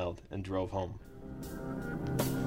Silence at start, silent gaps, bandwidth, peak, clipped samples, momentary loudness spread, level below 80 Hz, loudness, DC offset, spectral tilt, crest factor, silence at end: 0 s; none; 16 kHz; -20 dBFS; under 0.1%; 11 LU; -50 dBFS; -38 LUFS; under 0.1%; -6.5 dB/octave; 18 dB; 0 s